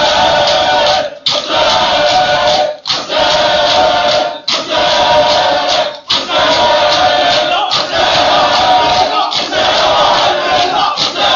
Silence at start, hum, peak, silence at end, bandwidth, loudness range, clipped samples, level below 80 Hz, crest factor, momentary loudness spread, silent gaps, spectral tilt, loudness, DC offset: 0 s; none; 0 dBFS; 0 s; 7.6 kHz; 1 LU; under 0.1%; -42 dBFS; 10 dB; 4 LU; none; -2 dB/octave; -10 LUFS; under 0.1%